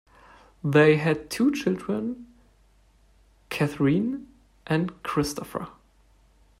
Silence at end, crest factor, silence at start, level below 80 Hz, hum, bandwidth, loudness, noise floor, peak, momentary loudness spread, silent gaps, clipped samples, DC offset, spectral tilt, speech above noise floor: 0.9 s; 20 dB; 0.65 s; -56 dBFS; none; 16 kHz; -25 LUFS; -60 dBFS; -6 dBFS; 16 LU; none; under 0.1%; under 0.1%; -6.5 dB/octave; 36 dB